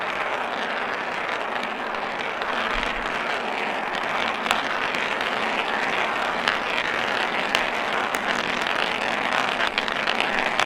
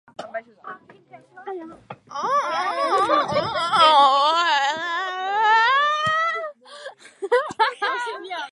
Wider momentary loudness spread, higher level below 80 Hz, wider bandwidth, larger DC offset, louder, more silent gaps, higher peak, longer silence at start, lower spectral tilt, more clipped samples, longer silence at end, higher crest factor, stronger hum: second, 4 LU vs 23 LU; first, -50 dBFS vs -64 dBFS; first, 18 kHz vs 11.5 kHz; neither; second, -24 LUFS vs -20 LUFS; neither; about the same, 0 dBFS vs -2 dBFS; second, 0 s vs 0.2 s; about the same, -2.5 dB/octave vs -2.5 dB/octave; neither; about the same, 0 s vs 0.05 s; about the same, 24 dB vs 20 dB; neither